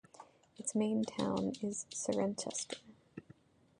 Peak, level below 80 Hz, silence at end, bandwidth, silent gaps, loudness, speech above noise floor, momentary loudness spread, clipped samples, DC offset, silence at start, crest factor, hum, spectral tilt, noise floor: -20 dBFS; -72 dBFS; 0.6 s; 11 kHz; none; -38 LUFS; 27 dB; 20 LU; under 0.1%; under 0.1%; 0.2 s; 20 dB; none; -4.5 dB/octave; -63 dBFS